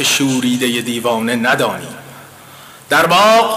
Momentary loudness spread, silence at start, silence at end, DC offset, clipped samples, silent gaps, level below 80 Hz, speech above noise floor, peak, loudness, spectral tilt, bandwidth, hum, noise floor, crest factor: 14 LU; 0 s; 0 s; under 0.1%; under 0.1%; none; -58 dBFS; 24 dB; -6 dBFS; -14 LUFS; -3 dB/octave; 16 kHz; none; -38 dBFS; 10 dB